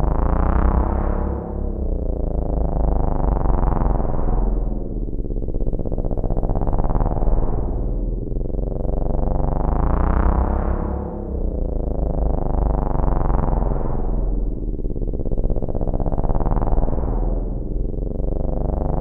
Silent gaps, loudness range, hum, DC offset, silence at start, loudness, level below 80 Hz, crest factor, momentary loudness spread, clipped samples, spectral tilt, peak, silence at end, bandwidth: none; 2 LU; none; under 0.1%; 0 s; -24 LUFS; -20 dBFS; 14 dB; 7 LU; under 0.1%; -12.5 dB/octave; -4 dBFS; 0 s; 2.4 kHz